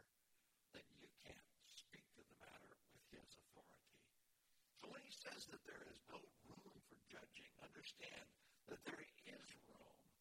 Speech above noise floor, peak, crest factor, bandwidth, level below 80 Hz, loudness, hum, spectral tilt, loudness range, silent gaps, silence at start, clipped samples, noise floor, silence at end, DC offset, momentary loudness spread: 24 dB; -40 dBFS; 24 dB; 16.5 kHz; -86 dBFS; -61 LUFS; none; -2.5 dB/octave; 7 LU; none; 0 s; under 0.1%; -83 dBFS; 0 s; under 0.1%; 11 LU